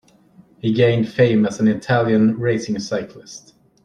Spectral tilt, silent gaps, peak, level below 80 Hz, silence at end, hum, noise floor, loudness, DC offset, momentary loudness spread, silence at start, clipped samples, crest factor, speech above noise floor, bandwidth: -6.5 dB/octave; none; -2 dBFS; -56 dBFS; 0.45 s; none; -51 dBFS; -18 LUFS; under 0.1%; 19 LU; 0.65 s; under 0.1%; 16 dB; 33 dB; 10 kHz